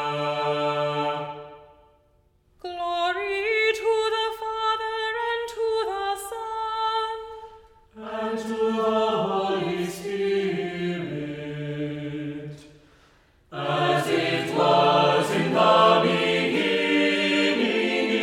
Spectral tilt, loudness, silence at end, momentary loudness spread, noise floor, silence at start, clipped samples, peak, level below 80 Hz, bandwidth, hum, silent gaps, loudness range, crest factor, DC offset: -5 dB/octave; -24 LUFS; 0 s; 13 LU; -62 dBFS; 0 s; under 0.1%; -6 dBFS; -60 dBFS; 16 kHz; none; none; 9 LU; 20 dB; under 0.1%